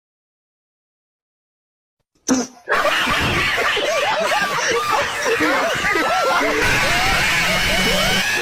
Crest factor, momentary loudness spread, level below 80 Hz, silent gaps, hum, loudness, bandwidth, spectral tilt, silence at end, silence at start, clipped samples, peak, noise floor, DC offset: 14 dB; 4 LU; -36 dBFS; none; none; -17 LUFS; 17.5 kHz; -2.5 dB/octave; 0 s; 2.25 s; under 0.1%; -6 dBFS; under -90 dBFS; under 0.1%